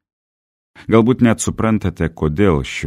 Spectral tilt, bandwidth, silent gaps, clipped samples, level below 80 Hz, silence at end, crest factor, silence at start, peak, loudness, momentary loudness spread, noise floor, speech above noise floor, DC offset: -6 dB/octave; 13.5 kHz; none; under 0.1%; -34 dBFS; 0 s; 16 dB; 0.8 s; 0 dBFS; -16 LUFS; 7 LU; under -90 dBFS; over 75 dB; under 0.1%